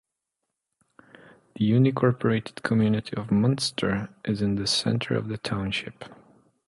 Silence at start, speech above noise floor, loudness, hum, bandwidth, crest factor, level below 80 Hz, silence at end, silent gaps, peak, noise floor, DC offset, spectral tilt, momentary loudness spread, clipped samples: 1.55 s; 58 dB; -25 LUFS; none; 11.5 kHz; 18 dB; -54 dBFS; 0.55 s; none; -8 dBFS; -83 dBFS; under 0.1%; -6 dB/octave; 9 LU; under 0.1%